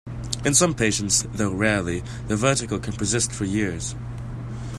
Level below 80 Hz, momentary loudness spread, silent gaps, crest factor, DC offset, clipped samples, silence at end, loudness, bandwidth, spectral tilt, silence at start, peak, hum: -42 dBFS; 14 LU; none; 22 dB; under 0.1%; under 0.1%; 0 s; -23 LUFS; 15 kHz; -3.5 dB/octave; 0.05 s; -2 dBFS; none